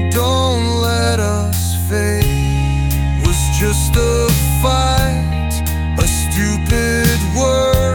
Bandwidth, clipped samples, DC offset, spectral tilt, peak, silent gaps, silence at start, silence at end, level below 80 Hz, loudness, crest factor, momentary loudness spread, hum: 19.5 kHz; under 0.1%; under 0.1%; -5 dB/octave; -2 dBFS; none; 0 s; 0 s; -20 dBFS; -15 LUFS; 12 dB; 3 LU; none